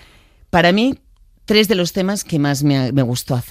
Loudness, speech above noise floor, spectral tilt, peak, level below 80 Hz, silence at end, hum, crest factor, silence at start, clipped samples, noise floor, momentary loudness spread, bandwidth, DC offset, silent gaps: -16 LUFS; 33 dB; -5 dB/octave; 0 dBFS; -44 dBFS; 0 s; none; 18 dB; 0.55 s; under 0.1%; -48 dBFS; 6 LU; 15.5 kHz; under 0.1%; none